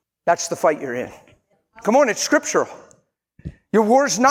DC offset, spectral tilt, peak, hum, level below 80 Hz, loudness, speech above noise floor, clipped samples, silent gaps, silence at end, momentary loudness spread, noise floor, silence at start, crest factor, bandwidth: under 0.1%; -3.5 dB/octave; -2 dBFS; none; -54 dBFS; -19 LUFS; 40 dB; under 0.1%; none; 0 s; 18 LU; -58 dBFS; 0.25 s; 18 dB; 16.5 kHz